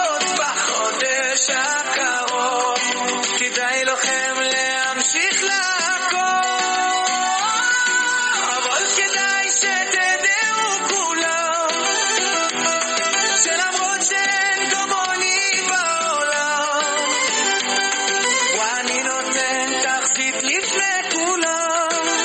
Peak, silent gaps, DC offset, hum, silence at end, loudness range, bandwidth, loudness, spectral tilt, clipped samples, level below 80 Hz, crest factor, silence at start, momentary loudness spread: -4 dBFS; none; under 0.1%; none; 0 s; 1 LU; 9.4 kHz; -18 LUFS; 1 dB/octave; under 0.1%; -70 dBFS; 16 dB; 0 s; 3 LU